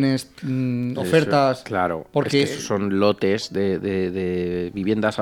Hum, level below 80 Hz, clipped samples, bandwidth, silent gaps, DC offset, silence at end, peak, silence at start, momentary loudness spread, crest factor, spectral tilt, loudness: none; -56 dBFS; under 0.1%; 17 kHz; none; under 0.1%; 0 s; -4 dBFS; 0 s; 6 LU; 18 dB; -6 dB/octave; -22 LUFS